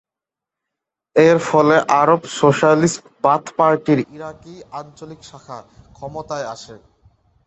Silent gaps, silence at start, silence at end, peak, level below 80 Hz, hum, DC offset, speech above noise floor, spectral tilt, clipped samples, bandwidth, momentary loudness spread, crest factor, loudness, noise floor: none; 1.15 s; 0.7 s; -2 dBFS; -56 dBFS; none; under 0.1%; 69 dB; -5.5 dB/octave; under 0.1%; 8.4 kHz; 22 LU; 18 dB; -16 LUFS; -87 dBFS